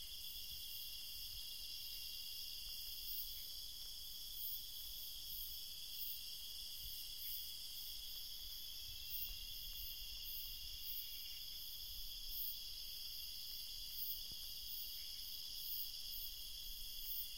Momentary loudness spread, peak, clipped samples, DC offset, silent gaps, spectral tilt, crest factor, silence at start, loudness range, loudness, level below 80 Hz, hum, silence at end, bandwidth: 4 LU; -30 dBFS; under 0.1%; 0.1%; none; 0.5 dB/octave; 18 dB; 0 s; 1 LU; -46 LUFS; -62 dBFS; none; 0 s; 16 kHz